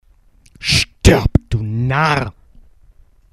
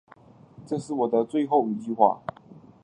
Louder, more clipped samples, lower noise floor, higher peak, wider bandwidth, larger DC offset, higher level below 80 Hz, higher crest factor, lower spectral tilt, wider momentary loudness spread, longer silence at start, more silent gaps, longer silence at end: first, -16 LUFS vs -25 LUFS; first, 0.1% vs under 0.1%; about the same, -50 dBFS vs -52 dBFS; first, 0 dBFS vs -4 dBFS; first, 14 kHz vs 10.5 kHz; neither; first, -26 dBFS vs -70 dBFS; about the same, 18 dB vs 22 dB; second, -5 dB/octave vs -7.5 dB/octave; about the same, 9 LU vs 11 LU; about the same, 0.6 s vs 0.6 s; neither; first, 1 s vs 0.25 s